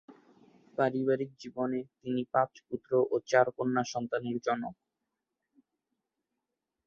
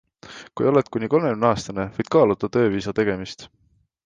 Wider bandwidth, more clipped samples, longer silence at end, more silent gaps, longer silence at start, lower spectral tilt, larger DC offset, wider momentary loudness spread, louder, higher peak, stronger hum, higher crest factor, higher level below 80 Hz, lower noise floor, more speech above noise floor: second, 7.2 kHz vs 9.4 kHz; neither; first, 2.15 s vs 0.6 s; neither; second, 0.1 s vs 0.25 s; about the same, -6 dB/octave vs -6.5 dB/octave; neither; second, 10 LU vs 18 LU; second, -31 LUFS vs -21 LUFS; second, -10 dBFS vs -4 dBFS; neither; about the same, 22 dB vs 18 dB; second, -74 dBFS vs -52 dBFS; first, -87 dBFS vs -43 dBFS; first, 56 dB vs 22 dB